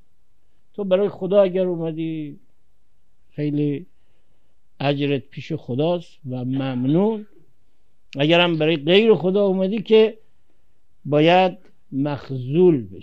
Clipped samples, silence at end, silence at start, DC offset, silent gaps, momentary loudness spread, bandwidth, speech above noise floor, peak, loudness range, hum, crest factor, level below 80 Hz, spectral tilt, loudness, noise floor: under 0.1%; 0 s; 0.8 s; 0.7%; none; 15 LU; 7.2 kHz; 48 dB; -2 dBFS; 9 LU; none; 20 dB; -64 dBFS; -8 dB/octave; -20 LUFS; -67 dBFS